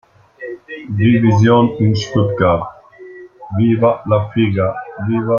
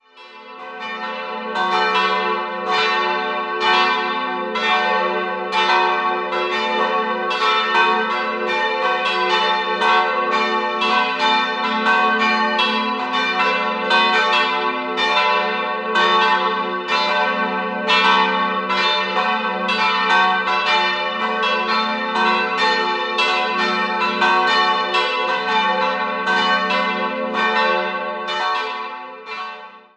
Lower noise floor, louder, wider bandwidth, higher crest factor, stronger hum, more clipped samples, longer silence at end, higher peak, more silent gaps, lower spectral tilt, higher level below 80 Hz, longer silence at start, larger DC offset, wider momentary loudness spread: second, -37 dBFS vs -41 dBFS; first, -15 LUFS vs -18 LUFS; second, 7 kHz vs 10.5 kHz; about the same, 14 dB vs 16 dB; neither; neither; second, 0 s vs 0.15 s; about the same, -2 dBFS vs -2 dBFS; neither; first, -8 dB/octave vs -3 dB/octave; first, -48 dBFS vs -68 dBFS; first, 0.4 s vs 0.15 s; neither; first, 19 LU vs 7 LU